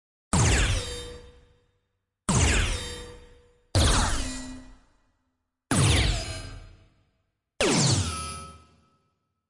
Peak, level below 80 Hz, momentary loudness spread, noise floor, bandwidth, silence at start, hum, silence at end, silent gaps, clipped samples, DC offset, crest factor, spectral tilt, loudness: -12 dBFS; -34 dBFS; 19 LU; -78 dBFS; 12 kHz; 0.35 s; none; 0.9 s; none; under 0.1%; under 0.1%; 16 dB; -3.5 dB/octave; -25 LUFS